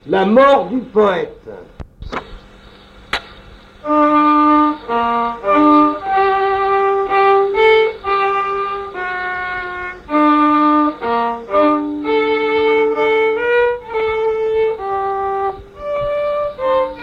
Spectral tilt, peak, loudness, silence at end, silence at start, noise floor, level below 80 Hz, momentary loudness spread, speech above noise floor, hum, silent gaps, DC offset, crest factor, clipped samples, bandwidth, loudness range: -6.5 dB/octave; -2 dBFS; -15 LUFS; 0 s; 0.05 s; -41 dBFS; -44 dBFS; 13 LU; 28 dB; none; none; under 0.1%; 14 dB; under 0.1%; 7.6 kHz; 5 LU